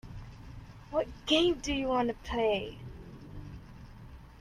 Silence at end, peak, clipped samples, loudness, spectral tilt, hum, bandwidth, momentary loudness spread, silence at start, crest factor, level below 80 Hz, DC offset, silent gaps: 0 s; -12 dBFS; under 0.1%; -31 LUFS; -4.5 dB/octave; none; 13.5 kHz; 24 LU; 0.05 s; 22 dB; -50 dBFS; under 0.1%; none